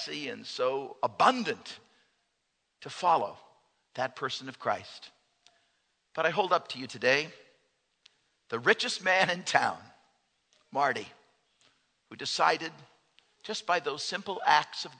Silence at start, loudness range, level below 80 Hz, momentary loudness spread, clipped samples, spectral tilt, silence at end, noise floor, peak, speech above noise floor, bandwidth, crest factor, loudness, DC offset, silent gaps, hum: 0 s; 5 LU; -82 dBFS; 18 LU; under 0.1%; -2.5 dB/octave; 0.05 s; -79 dBFS; -6 dBFS; 49 dB; 9.4 kHz; 26 dB; -29 LUFS; under 0.1%; none; none